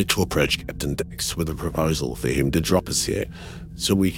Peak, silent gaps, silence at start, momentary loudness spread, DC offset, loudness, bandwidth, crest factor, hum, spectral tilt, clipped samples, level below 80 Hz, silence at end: -2 dBFS; none; 0 s; 7 LU; under 0.1%; -23 LUFS; 18 kHz; 20 dB; none; -4.5 dB/octave; under 0.1%; -38 dBFS; 0 s